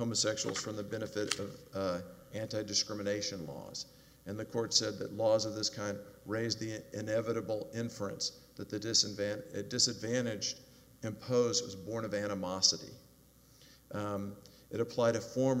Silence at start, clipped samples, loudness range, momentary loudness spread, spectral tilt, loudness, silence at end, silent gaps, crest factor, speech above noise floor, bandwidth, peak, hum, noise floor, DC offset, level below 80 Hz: 0 s; under 0.1%; 3 LU; 14 LU; -3 dB/octave; -35 LUFS; 0 s; none; 26 dB; 27 dB; 16 kHz; -10 dBFS; none; -62 dBFS; under 0.1%; -70 dBFS